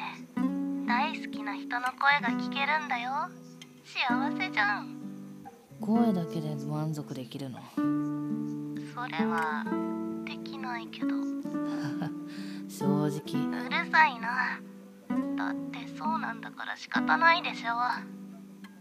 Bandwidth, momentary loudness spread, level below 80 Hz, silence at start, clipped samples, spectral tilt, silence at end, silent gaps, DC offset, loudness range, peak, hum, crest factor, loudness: 15.5 kHz; 15 LU; -80 dBFS; 0 s; under 0.1%; -5.5 dB/octave; 0 s; none; under 0.1%; 4 LU; -10 dBFS; none; 22 dB; -30 LUFS